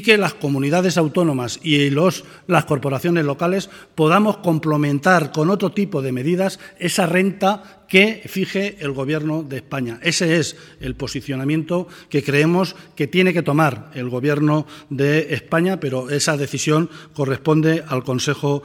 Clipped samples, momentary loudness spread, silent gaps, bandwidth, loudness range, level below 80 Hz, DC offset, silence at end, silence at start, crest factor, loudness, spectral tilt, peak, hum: under 0.1%; 10 LU; none; 17 kHz; 3 LU; -54 dBFS; under 0.1%; 0 s; 0 s; 18 dB; -19 LUFS; -5.5 dB/octave; 0 dBFS; none